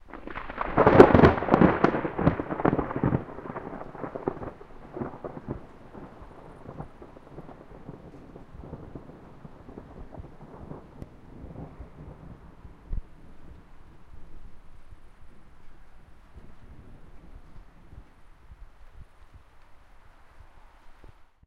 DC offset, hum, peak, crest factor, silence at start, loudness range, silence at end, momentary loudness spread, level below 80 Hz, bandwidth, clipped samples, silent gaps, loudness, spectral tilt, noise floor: under 0.1%; none; 0 dBFS; 30 dB; 0.15 s; 26 LU; 0.25 s; 28 LU; -44 dBFS; 8.8 kHz; under 0.1%; none; -23 LUFS; -9 dB/octave; -51 dBFS